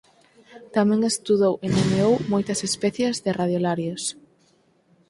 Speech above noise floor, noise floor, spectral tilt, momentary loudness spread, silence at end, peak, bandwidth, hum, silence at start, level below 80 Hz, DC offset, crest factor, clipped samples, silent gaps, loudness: 40 dB; -62 dBFS; -5 dB/octave; 6 LU; 1 s; -8 dBFS; 11.5 kHz; none; 0.5 s; -56 dBFS; under 0.1%; 16 dB; under 0.1%; none; -23 LUFS